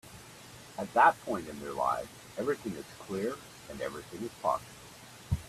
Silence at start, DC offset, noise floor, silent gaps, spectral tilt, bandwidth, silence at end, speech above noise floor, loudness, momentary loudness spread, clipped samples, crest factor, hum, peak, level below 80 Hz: 0.05 s; under 0.1%; -51 dBFS; none; -5 dB/octave; 15 kHz; 0 s; 19 dB; -32 LUFS; 24 LU; under 0.1%; 22 dB; none; -10 dBFS; -54 dBFS